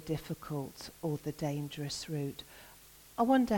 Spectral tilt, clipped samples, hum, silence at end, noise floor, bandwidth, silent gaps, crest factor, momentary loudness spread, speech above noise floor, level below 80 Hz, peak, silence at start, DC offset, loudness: -6 dB/octave; under 0.1%; none; 0 s; -57 dBFS; 17.5 kHz; none; 18 dB; 20 LU; 23 dB; -60 dBFS; -16 dBFS; 0 s; under 0.1%; -36 LUFS